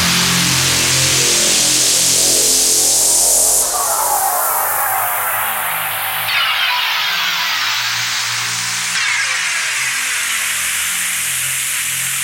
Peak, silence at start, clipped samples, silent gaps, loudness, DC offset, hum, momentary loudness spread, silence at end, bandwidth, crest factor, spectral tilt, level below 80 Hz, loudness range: 0 dBFS; 0 s; under 0.1%; none; -13 LUFS; under 0.1%; none; 6 LU; 0 s; 16.5 kHz; 16 dB; 0 dB/octave; -48 dBFS; 5 LU